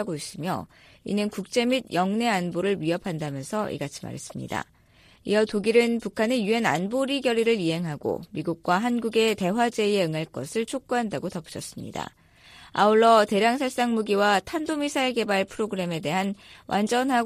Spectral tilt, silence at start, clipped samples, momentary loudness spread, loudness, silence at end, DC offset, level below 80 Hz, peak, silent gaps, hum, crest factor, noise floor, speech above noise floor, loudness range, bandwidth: -5 dB/octave; 0 s; under 0.1%; 12 LU; -25 LUFS; 0 s; under 0.1%; -60 dBFS; -6 dBFS; none; none; 18 dB; -57 dBFS; 32 dB; 5 LU; 15.5 kHz